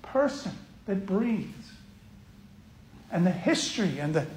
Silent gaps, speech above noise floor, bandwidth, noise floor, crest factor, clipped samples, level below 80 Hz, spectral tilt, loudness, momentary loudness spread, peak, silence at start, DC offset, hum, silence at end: none; 24 dB; 15.5 kHz; -52 dBFS; 18 dB; under 0.1%; -58 dBFS; -5.5 dB/octave; -29 LUFS; 16 LU; -12 dBFS; 0.05 s; under 0.1%; none; 0 s